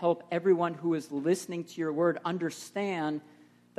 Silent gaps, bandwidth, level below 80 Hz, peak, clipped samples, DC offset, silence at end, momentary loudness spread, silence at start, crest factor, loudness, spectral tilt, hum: none; 13.5 kHz; -80 dBFS; -14 dBFS; under 0.1%; under 0.1%; 0.55 s; 8 LU; 0 s; 16 dB; -31 LUFS; -6 dB/octave; 60 Hz at -65 dBFS